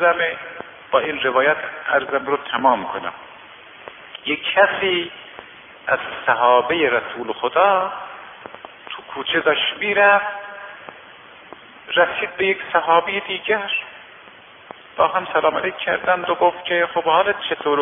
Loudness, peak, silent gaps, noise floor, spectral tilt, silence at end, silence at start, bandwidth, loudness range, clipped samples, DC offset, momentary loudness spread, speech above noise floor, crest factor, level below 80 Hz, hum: -19 LUFS; -2 dBFS; none; -44 dBFS; -7 dB/octave; 0 s; 0 s; 3.8 kHz; 2 LU; under 0.1%; under 0.1%; 21 LU; 25 dB; 20 dB; -62 dBFS; none